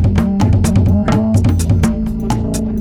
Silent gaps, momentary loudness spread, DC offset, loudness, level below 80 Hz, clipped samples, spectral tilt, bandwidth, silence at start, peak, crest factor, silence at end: none; 6 LU; under 0.1%; -14 LUFS; -22 dBFS; under 0.1%; -7.5 dB/octave; 15.5 kHz; 0 s; -2 dBFS; 12 dB; 0 s